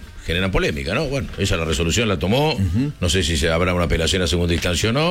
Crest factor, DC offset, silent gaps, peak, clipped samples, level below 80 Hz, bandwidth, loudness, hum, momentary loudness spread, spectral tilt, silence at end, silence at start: 12 dB; 0.1%; none; -8 dBFS; under 0.1%; -30 dBFS; 16.5 kHz; -20 LUFS; none; 4 LU; -4.5 dB/octave; 0 s; 0 s